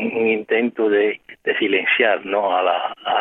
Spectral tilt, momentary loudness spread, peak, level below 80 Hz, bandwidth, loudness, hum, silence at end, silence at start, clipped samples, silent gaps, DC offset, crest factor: -7 dB/octave; 6 LU; -4 dBFS; -72 dBFS; 4 kHz; -19 LUFS; none; 0 s; 0 s; under 0.1%; none; under 0.1%; 16 dB